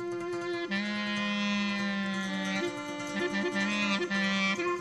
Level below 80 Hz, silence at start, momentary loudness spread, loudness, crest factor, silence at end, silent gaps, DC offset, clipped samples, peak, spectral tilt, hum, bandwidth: -66 dBFS; 0 s; 6 LU; -31 LUFS; 14 dB; 0 s; none; under 0.1%; under 0.1%; -18 dBFS; -4.5 dB/octave; none; 12 kHz